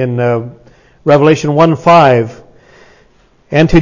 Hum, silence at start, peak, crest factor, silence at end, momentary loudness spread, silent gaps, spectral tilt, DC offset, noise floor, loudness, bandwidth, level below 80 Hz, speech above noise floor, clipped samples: none; 0 s; 0 dBFS; 10 dB; 0 s; 12 LU; none; -7 dB/octave; under 0.1%; -48 dBFS; -10 LUFS; 7.4 kHz; -32 dBFS; 39 dB; 0.3%